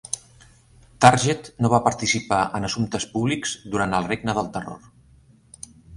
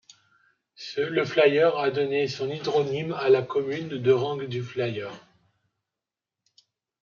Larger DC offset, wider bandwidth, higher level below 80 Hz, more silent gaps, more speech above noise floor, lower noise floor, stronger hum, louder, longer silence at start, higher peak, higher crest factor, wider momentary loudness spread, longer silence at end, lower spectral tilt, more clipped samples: neither; first, 11.5 kHz vs 7.2 kHz; first, -50 dBFS vs -74 dBFS; neither; second, 32 dB vs 64 dB; second, -54 dBFS vs -89 dBFS; neither; first, -22 LUFS vs -25 LUFS; second, 0.1 s vs 0.8 s; first, 0 dBFS vs -8 dBFS; about the same, 24 dB vs 20 dB; first, 19 LU vs 11 LU; second, 0 s vs 1.85 s; second, -4.5 dB/octave vs -6 dB/octave; neither